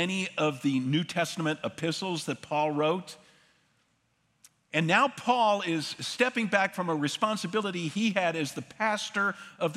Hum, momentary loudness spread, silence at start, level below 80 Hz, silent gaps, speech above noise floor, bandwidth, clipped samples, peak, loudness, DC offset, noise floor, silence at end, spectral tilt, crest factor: none; 7 LU; 0 s; -78 dBFS; none; 43 dB; 15 kHz; under 0.1%; -8 dBFS; -29 LUFS; under 0.1%; -72 dBFS; 0 s; -4.5 dB/octave; 22 dB